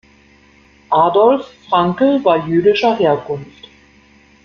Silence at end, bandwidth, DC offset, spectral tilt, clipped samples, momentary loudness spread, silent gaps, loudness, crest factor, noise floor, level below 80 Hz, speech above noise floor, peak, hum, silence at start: 0.95 s; 6.8 kHz; under 0.1%; -7.5 dB/octave; under 0.1%; 8 LU; none; -14 LUFS; 14 dB; -49 dBFS; -54 dBFS; 35 dB; -2 dBFS; none; 0.9 s